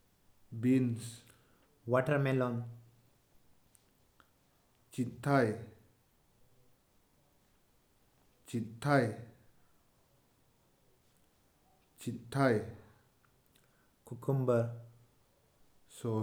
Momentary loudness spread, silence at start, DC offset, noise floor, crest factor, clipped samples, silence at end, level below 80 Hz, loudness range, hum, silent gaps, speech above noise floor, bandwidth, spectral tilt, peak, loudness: 19 LU; 0.5 s; under 0.1%; -71 dBFS; 22 dB; under 0.1%; 0 s; -74 dBFS; 5 LU; none; none; 38 dB; 17.5 kHz; -7.5 dB/octave; -16 dBFS; -34 LUFS